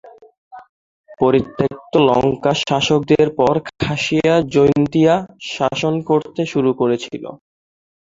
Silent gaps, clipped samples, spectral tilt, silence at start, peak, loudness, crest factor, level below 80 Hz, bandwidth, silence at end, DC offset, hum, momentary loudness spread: 0.38-0.51 s, 0.69-1.04 s; under 0.1%; -6 dB/octave; 0.05 s; 0 dBFS; -17 LUFS; 16 dB; -48 dBFS; 7.8 kHz; 0.65 s; under 0.1%; none; 8 LU